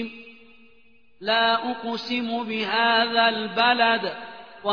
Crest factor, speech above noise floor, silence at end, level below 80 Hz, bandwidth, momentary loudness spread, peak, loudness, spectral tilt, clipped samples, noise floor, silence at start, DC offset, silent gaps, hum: 18 dB; 37 dB; 0 s; -72 dBFS; 5.4 kHz; 15 LU; -6 dBFS; -22 LUFS; -4.5 dB/octave; under 0.1%; -60 dBFS; 0 s; 0.2%; none; none